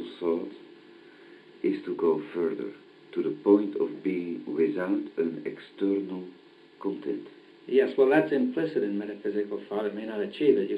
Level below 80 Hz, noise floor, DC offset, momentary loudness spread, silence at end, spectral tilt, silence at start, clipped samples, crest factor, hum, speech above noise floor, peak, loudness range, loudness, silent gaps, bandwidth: -80 dBFS; -52 dBFS; under 0.1%; 14 LU; 0 s; -8.5 dB/octave; 0 s; under 0.1%; 20 dB; none; 24 dB; -8 dBFS; 4 LU; -28 LUFS; none; 5 kHz